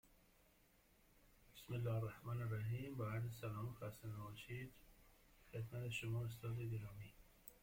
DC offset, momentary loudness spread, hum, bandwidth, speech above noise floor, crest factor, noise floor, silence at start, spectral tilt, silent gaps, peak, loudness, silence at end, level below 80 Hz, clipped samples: under 0.1%; 15 LU; none; 16.5 kHz; 27 dB; 16 dB; -74 dBFS; 0.05 s; -6.5 dB/octave; none; -34 dBFS; -48 LUFS; 0.05 s; -68 dBFS; under 0.1%